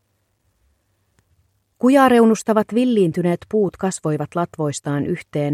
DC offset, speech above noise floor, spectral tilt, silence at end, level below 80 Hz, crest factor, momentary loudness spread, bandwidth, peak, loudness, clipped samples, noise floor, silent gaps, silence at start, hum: under 0.1%; 49 dB; -6.5 dB/octave; 0 s; -58 dBFS; 18 dB; 11 LU; 14 kHz; -2 dBFS; -18 LUFS; under 0.1%; -67 dBFS; none; 1.8 s; none